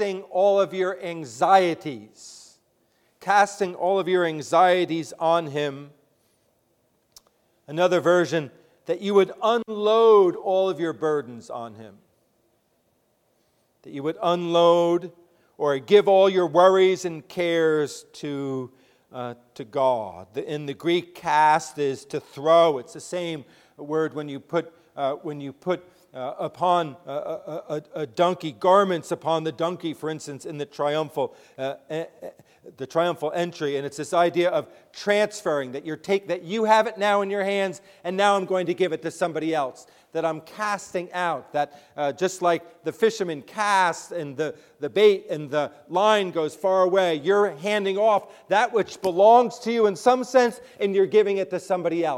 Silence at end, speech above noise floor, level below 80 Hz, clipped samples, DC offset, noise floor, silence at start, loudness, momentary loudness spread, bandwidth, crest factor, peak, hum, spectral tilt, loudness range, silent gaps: 0 s; 45 dB; -74 dBFS; under 0.1%; under 0.1%; -68 dBFS; 0 s; -23 LUFS; 15 LU; 15.5 kHz; 20 dB; -4 dBFS; none; -5 dB/octave; 8 LU; none